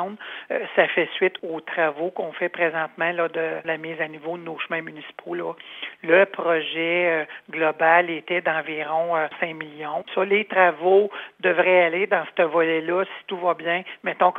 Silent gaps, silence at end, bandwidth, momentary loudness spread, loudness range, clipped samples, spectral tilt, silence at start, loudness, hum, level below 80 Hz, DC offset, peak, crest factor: none; 0 s; 4.1 kHz; 13 LU; 6 LU; under 0.1%; -7 dB/octave; 0 s; -22 LUFS; none; -84 dBFS; under 0.1%; -2 dBFS; 20 dB